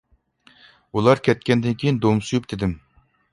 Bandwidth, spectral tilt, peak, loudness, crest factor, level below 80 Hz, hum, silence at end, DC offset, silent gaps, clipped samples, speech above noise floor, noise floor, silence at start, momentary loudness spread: 11.5 kHz; -6.5 dB/octave; -2 dBFS; -21 LUFS; 20 dB; -46 dBFS; none; 0.55 s; under 0.1%; none; under 0.1%; 37 dB; -57 dBFS; 0.95 s; 10 LU